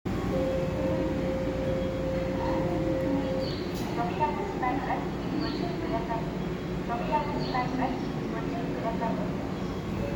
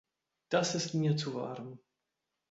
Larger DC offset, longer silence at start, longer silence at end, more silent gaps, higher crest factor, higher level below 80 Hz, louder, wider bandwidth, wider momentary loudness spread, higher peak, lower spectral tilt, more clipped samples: neither; second, 0.05 s vs 0.5 s; second, 0 s vs 0.75 s; neither; first, 30 dB vs 20 dB; first, -42 dBFS vs -74 dBFS; first, -30 LUFS vs -33 LUFS; first, 20 kHz vs 8 kHz; second, 4 LU vs 13 LU; first, 0 dBFS vs -16 dBFS; first, -7 dB/octave vs -5 dB/octave; neither